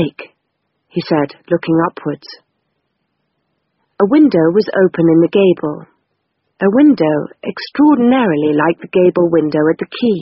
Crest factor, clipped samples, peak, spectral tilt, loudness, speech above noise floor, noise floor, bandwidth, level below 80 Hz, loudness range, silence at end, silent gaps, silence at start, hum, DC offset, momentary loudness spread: 14 dB; under 0.1%; 0 dBFS; -6 dB/octave; -13 LUFS; 57 dB; -69 dBFS; 5.8 kHz; -56 dBFS; 8 LU; 0 s; none; 0 s; none; under 0.1%; 14 LU